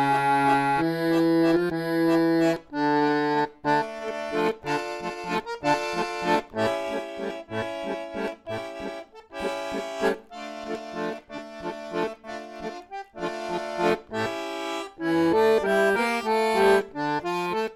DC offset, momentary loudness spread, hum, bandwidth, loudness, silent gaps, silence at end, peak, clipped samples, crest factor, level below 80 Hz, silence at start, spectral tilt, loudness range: under 0.1%; 15 LU; none; 14.5 kHz; -26 LUFS; none; 0 s; -8 dBFS; under 0.1%; 16 dB; -58 dBFS; 0 s; -5.5 dB/octave; 9 LU